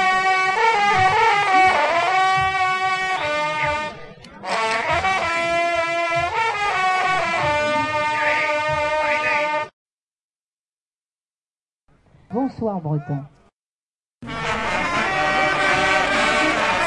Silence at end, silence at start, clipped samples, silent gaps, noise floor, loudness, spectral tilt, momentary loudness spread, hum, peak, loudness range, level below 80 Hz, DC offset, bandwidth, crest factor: 0 s; 0 s; under 0.1%; 9.73-9.86 s, 9.92-11.18 s, 11.38-11.45 s, 11.51-11.80 s, 13.53-14.19 s; under -90 dBFS; -19 LUFS; -3.5 dB/octave; 10 LU; none; -4 dBFS; 12 LU; -50 dBFS; under 0.1%; 11.5 kHz; 16 dB